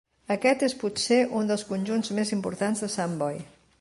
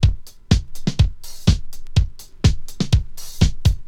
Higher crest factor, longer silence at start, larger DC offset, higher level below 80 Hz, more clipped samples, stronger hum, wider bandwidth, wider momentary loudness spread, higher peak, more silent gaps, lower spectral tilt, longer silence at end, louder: about the same, 18 dB vs 18 dB; first, 0.3 s vs 0 s; neither; second, -66 dBFS vs -24 dBFS; neither; neither; second, 11.5 kHz vs 16 kHz; about the same, 7 LU vs 7 LU; second, -10 dBFS vs 0 dBFS; neither; second, -4.5 dB/octave vs -6 dB/octave; first, 0.35 s vs 0 s; second, -27 LUFS vs -21 LUFS